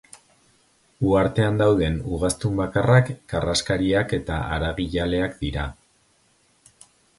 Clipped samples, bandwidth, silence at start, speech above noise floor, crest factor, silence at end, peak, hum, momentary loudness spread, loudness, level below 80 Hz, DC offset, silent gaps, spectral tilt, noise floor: under 0.1%; 11.5 kHz; 1 s; 41 dB; 20 dB; 1.45 s; -4 dBFS; none; 8 LU; -22 LUFS; -38 dBFS; under 0.1%; none; -6 dB/octave; -62 dBFS